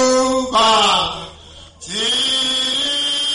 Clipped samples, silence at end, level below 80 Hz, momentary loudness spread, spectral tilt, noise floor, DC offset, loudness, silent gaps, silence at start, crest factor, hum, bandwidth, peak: under 0.1%; 0 s; -46 dBFS; 15 LU; -1.5 dB/octave; -40 dBFS; under 0.1%; -15 LUFS; none; 0 s; 12 dB; none; 11.5 kHz; -6 dBFS